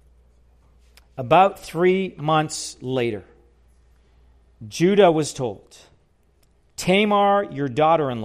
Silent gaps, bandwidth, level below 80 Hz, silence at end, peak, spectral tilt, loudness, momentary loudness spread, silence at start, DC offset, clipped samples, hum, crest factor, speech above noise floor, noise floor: none; 15 kHz; -56 dBFS; 0 s; -4 dBFS; -5 dB/octave; -20 LUFS; 18 LU; 1.15 s; under 0.1%; under 0.1%; none; 18 dB; 40 dB; -60 dBFS